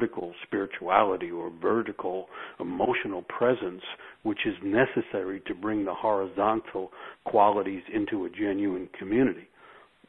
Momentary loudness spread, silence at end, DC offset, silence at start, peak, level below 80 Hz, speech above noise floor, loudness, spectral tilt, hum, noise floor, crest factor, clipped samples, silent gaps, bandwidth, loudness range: 13 LU; 0.35 s; under 0.1%; 0 s; -4 dBFS; -62 dBFS; 26 dB; -28 LUFS; -8.5 dB/octave; none; -54 dBFS; 24 dB; under 0.1%; none; 4 kHz; 2 LU